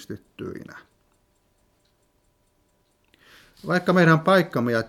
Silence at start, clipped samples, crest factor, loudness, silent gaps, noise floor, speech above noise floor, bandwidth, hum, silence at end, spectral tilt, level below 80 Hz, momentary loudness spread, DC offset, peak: 0 s; under 0.1%; 20 dB; -19 LUFS; none; -66 dBFS; 45 dB; 15 kHz; none; 0 s; -7 dB/octave; -64 dBFS; 22 LU; under 0.1%; -4 dBFS